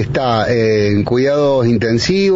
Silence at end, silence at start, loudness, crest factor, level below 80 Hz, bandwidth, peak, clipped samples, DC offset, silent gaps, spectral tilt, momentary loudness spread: 0 s; 0 s; -14 LUFS; 8 dB; -40 dBFS; 7.8 kHz; -4 dBFS; under 0.1%; under 0.1%; none; -5.5 dB/octave; 1 LU